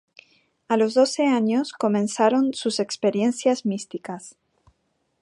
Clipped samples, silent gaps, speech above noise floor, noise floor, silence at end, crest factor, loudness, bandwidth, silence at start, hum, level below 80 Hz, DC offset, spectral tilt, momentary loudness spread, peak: under 0.1%; none; 50 dB; -71 dBFS; 0.9 s; 18 dB; -22 LUFS; 11.5 kHz; 0.7 s; none; -72 dBFS; under 0.1%; -4.5 dB/octave; 12 LU; -6 dBFS